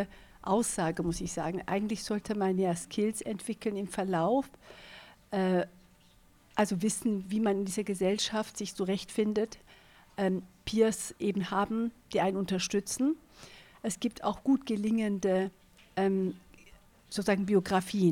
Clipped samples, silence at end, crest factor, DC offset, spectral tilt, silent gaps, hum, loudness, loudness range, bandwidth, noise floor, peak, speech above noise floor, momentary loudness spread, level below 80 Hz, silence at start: under 0.1%; 0 s; 18 dB; under 0.1%; -5 dB/octave; none; none; -31 LUFS; 2 LU; 16.5 kHz; -61 dBFS; -14 dBFS; 31 dB; 11 LU; -60 dBFS; 0 s